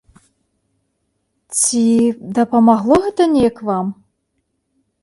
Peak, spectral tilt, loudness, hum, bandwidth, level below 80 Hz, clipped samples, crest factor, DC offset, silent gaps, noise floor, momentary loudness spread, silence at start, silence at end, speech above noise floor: 0 dBFS; -4.5 dB/octave; -15 LUFS; none; 11.5 kHz; -50 dBFS; under 0.1%; 16 dB; under 0.1%; none; -70 dBFS; 9 LU; 1.5 s; 1.1 s; 55 dB